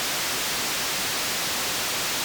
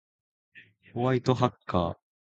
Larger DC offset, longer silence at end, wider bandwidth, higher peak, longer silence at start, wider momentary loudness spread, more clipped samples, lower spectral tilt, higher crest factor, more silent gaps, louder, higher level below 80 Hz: neither; second, 0 s vs 0.3 s; first, over 20 kHz vs 7.8 kHz; second, -22 dBFS vs -6 dBFS; second, 0 s vs 0.55 s; second, 0 LU vs 8 LU; neither; second, 0 dB/octave vs -7.5 dB/octave; second, 4 dB vs 24 dB; neither; first, -24 LUFS vs -28 LUFS; about the same, -56 dBFS vs -52 dBFS